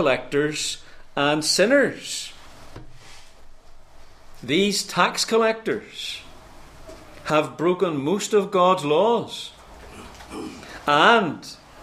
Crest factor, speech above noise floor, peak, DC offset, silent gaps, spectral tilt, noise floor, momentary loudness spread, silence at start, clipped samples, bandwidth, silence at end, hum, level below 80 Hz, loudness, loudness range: 22 dB; 22 dB; -2 dBFS; under 0.1%; none; -3.5 dB/octave; -43 dBFS; 19 LU; 0 s; under 0.1%; 15.5 kHz; 0 s; none; -50 dBFS; -21 LUFS; 4 LU